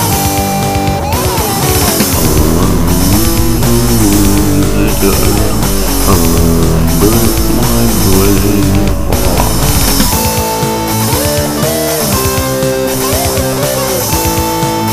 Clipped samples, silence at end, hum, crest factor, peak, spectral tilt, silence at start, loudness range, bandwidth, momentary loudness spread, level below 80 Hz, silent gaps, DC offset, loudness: 0.2%; 0 s; none; 10 dB; 0 dBFS; -4.5 dB/octave; 0 s; 2 LU; 16.5 kHz; 3 LU; -18 dBFS; none; 10%; -10 LUFS